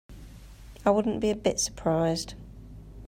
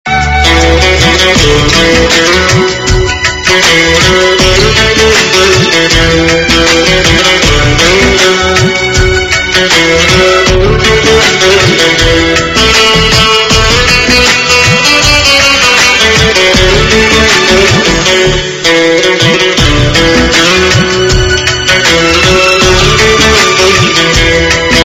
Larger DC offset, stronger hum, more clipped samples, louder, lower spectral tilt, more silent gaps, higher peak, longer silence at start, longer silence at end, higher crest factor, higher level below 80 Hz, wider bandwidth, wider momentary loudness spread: neither; neither; second, under 0.1% vs 5%; second, -27 LUFS vs -5 LUFS; first, -4.5 dB/octave vs -3 dB/octave; neither; second, -10 dBFS vs 0 dBFS; about the same, 0.1 s vs 0.05 s; about the same, 0 s vs 0 s; first, 20 dB vs 6 dB; second, -48 dBFS vs -18 dBFS; about the same, 16 kHz vs 16 kHz; first, 22 LU vs 3 LU